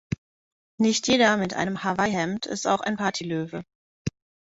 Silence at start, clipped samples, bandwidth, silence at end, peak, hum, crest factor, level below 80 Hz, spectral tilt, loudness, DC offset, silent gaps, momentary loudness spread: 0.1 s; under 0.1%; 8 kHz; 0.3 s; -6 dBFS; none; 20 dB; -56 dBFS; -4 dB/octave; -24 LUFS; under 0.1%; 0.18-0.78 s, 3.75-4.05 s; 16 LU